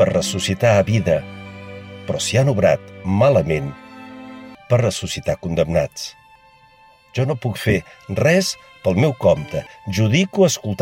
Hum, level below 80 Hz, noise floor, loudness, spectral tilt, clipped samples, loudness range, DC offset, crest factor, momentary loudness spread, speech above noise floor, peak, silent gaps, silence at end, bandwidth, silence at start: none; -48 dBFS; -50 dBFS; -19 LUFS; -5.5 dB/octave; under 0.1%; 5 LU; under 0.1%; 16 dB; 20 LU; 32 dB; -2 dBFS; none; 0 s; 16.5 kHz; 0 s